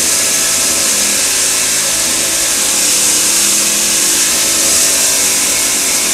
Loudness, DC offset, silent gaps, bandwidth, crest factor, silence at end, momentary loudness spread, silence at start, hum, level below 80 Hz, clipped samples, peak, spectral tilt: -9 LUFS; under 0.1%; none; over 20 kHz; 12 dB; 0 s; 2 LU; 0 s; none; -44 dBFS; under 0.1%; 0 dBFS; 1 dB/octave